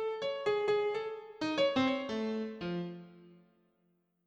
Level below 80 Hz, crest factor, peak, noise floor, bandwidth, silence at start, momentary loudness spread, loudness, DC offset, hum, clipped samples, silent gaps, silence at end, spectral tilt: -72 dBFS; 16 dB; -18 dBFS; -76 dBFS; 8.6 kHz; 0 s; 10 LU; -34 LUFS; under 0.1%; none; under 0.1%; none; 0.95 s; -5.5 dB/octave